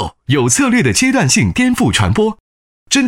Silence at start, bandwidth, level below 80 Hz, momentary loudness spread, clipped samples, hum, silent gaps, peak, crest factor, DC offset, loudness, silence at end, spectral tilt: 0 s; 16.5 kHz; -36 dBFS; 5 LU; under 0.1%; none; 2.40-2.86 s; 0 dBFS; 12 dB; under 0.1%; -13 LUFS; 0 s; -4 dB/octave